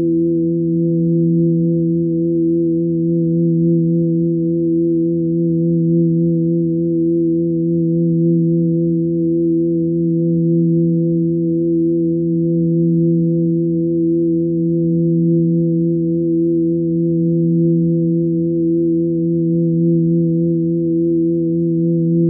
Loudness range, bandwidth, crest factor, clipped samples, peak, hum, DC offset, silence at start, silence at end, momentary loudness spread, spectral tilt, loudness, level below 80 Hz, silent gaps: 0 LU; 0.6 kHz; 8 dB; under 0.1%; -6 dBFS; none; under 0.1%; 0 s; 0 s; 2 LU; -22.5 dB/octave; -16 LUFS; -52 dBFS; none